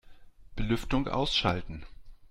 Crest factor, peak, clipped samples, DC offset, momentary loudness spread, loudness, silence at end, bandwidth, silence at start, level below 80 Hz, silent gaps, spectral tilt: 20 dB; -12 dBFS; under 0.1%; under 0.1%; 19 LU; -30 LUFS; 0.05 s; 14 kHz; 0.05 s; -40 dBFS; none; -5.5 dB/octave